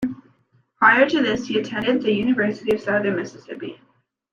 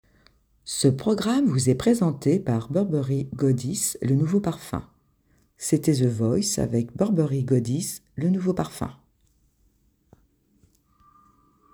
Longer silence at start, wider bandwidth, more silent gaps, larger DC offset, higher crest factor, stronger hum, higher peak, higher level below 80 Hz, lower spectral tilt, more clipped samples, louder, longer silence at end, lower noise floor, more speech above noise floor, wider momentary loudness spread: second, 0 s vs 0.65 s; second, 7.4 kHz vs over 20 kHz; neither; neither; about the same, 20 dB vs 18 dB; neither; first, -2 dBFS vs -6 dBFS; about the same, -58 dBFS vs -54 dBFS; about the same, -5.5 dB/octave vs -6 dB/octave; neither; first, -20 LUFS vs -24 LUFS; second, 0.6 s vs 2.8 s; about the same, -62 dBFS vs -65 dBFS; about the same, 42 dB vs 42 dB; first, 19 LU vs 10 LU